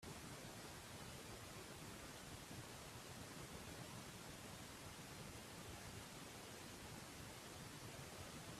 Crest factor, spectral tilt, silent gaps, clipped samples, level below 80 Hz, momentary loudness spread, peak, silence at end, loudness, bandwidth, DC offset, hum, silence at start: 16 dB; -3.5 dB/octave; none; under 0.1%; -70 dBFS; 1 LU; -40 dBFS; 0 s; -54 LUFS; 15.5 kHz; under 0.1%; none; 0 s